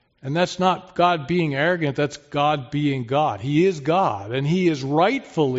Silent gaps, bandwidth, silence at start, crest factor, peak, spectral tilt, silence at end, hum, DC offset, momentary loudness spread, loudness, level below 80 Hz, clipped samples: none; 8 kHz; 0.25 s; 16 dB; -4 dBFS; -5 dB/octave; 0 s; none; under 0.1%; 4 LU; -21 LUFS; -58 dBFS; under 0.1%